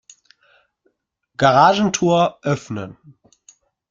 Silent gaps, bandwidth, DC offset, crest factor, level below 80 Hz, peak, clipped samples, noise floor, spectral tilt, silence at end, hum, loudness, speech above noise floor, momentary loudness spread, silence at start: none; 7.8 kHz; under 0.1%; 20 dB; -56 dBFS; 0 dBFS; under 0.1%; -69 dBFS; -5 dB/octave; 1 s; none; -16 LUFS; 52 dB; 19 LU; 1.4 s